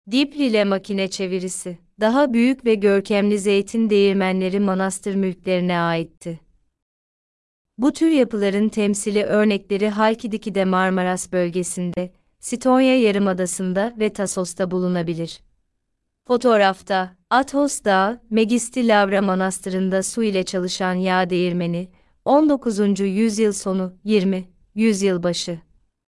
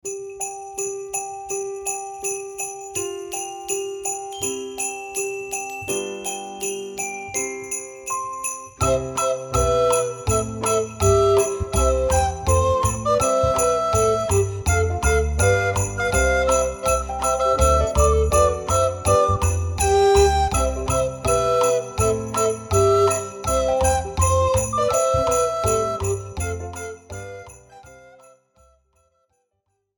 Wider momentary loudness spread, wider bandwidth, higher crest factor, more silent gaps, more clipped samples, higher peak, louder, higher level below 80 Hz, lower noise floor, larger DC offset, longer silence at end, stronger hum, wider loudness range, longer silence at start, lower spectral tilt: about the same, 9 LU vs 10 LU; second, 12 kHz vs 19 kHz; about the same, 16 dB vs 18 dB; first, 6.82-7.65 s vs none; neither; about the same, -4 dBFS vs -4 dBFS; about the same, -20 LUFS vs -21 LUFS; second, -56 dBFS vs -32 dBFS; about the same, -74 dBFS vs -74 dBFS; neither; second, 0.5 s vs 2 s; neither; second, 4 LU vs 8 LU; about the same, 0.05 s vs 0.05 s; about the same, -5 dB/octave vs -4 dB/octave